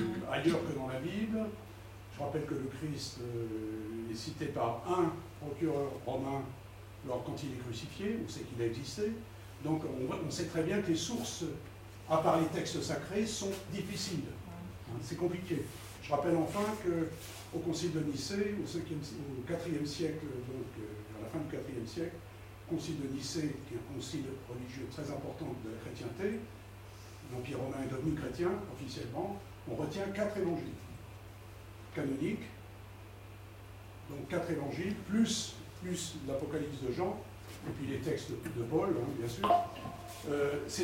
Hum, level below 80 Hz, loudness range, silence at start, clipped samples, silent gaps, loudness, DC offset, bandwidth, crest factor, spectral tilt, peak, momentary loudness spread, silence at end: none; -60 dBFS; 6 LU; 0 s; under 0.1%; none; -37 LUFS; under 0.1%; 16 kHz; 22 dB; -5.5 dB/octave; -16 dBFS; 16 LU; 0 s